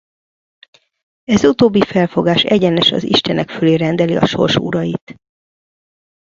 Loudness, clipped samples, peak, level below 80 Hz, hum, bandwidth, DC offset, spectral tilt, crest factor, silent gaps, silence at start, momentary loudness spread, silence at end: -14 LUFS; under 0.1%; 0 dBFS; -48 dBFS; none; 7.6 kHz; under 0.1%; -6 dB/octave; 16 dB; 5.01-5.07 s; 1.3 s; 7 LU; 1.15 s